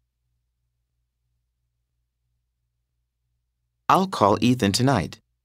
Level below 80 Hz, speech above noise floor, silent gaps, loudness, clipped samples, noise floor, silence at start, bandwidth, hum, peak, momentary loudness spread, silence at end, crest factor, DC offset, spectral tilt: -56 dBFS; 57 dB; none; -21 LUFS; under 0.1%; -77 dBFS; 3.9 s; 16 kHz; none; -2 dBFS; 9 LU; 0.35 s; 24 dB; under 0.1%; -5.5 dB/octave